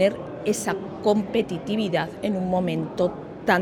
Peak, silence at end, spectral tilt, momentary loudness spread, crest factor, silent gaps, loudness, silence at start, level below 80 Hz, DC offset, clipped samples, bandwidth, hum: -4 dBFS; 0 s; -5.5 dB/octave; 4 LU; 20 dB; none; -25 LUFS; 0 s; -54 dBFS; under 0.1%; under 0.1%; 18 kHz; none